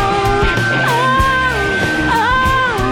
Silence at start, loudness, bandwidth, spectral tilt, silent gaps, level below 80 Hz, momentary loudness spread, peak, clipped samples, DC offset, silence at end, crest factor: 0 s; -13 LUFS; 17 kHz; -5 dB/octave; none; -26 dBFS; 2 LU; -2 dBFS; under 0.1%; under 0.1%; 0 s; 12 dB